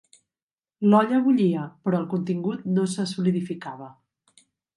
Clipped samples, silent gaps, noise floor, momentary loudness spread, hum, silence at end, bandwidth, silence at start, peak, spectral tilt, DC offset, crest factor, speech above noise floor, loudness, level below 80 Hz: under 0.1%; none; under -90 dBFS; 13 LU; none; 0.85 s; 11.5 kHz; 0.8 s; -8 dBFS; -7 dB/octave; under 0.1%; 18 dB; over 67 dB; -24 LUFS; -72 dBFS